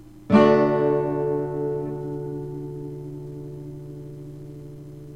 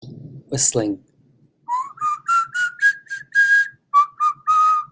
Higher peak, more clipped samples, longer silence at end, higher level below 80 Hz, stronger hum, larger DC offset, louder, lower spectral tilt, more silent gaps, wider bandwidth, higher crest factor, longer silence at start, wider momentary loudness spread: about the same, -4 dBFS vs -4 dBFS; neither; about the same, 0 s vs 0.05 s; first, -54 dBFS vs -62 dBFS; neither; first, 0.2% vs under 0.1%; second, -23 LUFS vs -18 LUFS; first, -8.5 dB/octave vs -2.5 dB/octave; neither; first, 9 kHz vs 8 kHz; about the same, 20 dB vs 16 dB; about the same, 0 s vs 0.05 s; first, 22 LU vs 12 LU